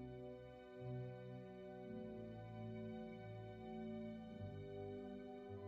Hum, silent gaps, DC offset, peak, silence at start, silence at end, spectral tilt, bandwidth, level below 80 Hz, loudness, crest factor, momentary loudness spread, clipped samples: none; none; under 0.1%; -38 dBFS; 0 s; 0 s; -7.5 dB/octave; 7.6 kHz; -72 dBFS; -53 LUFS; 12 dB; 4 LU; under 0.1%